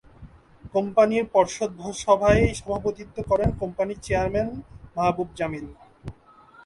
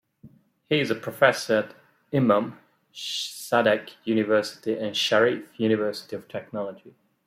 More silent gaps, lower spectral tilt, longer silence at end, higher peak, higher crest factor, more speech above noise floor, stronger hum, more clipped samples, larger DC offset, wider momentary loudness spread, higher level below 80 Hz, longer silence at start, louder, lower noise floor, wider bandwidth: neither; first, -6 dB/octave vs -4.5 dB/octave; first, 0.55 s vs 0.35 s; about the same, -4 dBFS vs -2 dBFS; about the same, 20 dB vs 24 dB; about the same, 29 dB vs 29 dB; neither; neither; neither; first, 18 LU vs 14 LU; first, -40 dBFS vs -72 dBFS; about the same, 0.2 s vs 0.25 s; about the same, -24 LUFS vs -25 LUFS; about the same, -52 dBFS vs -53 dBFS; second, 11.5 kHz vs 16 kHz